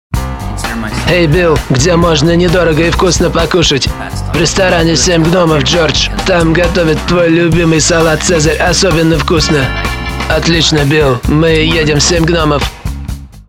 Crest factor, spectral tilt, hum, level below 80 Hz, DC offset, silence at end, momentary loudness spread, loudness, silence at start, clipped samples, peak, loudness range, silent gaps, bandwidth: 10 dB; -4.5 dB/octave; none; -20 dBFS; under 0.1%; 0.05 s; 8 LU; -10 LUFS; 0.1 s; under 0.1%; 0 dBFS; 1 LU; none; 16.5 kHz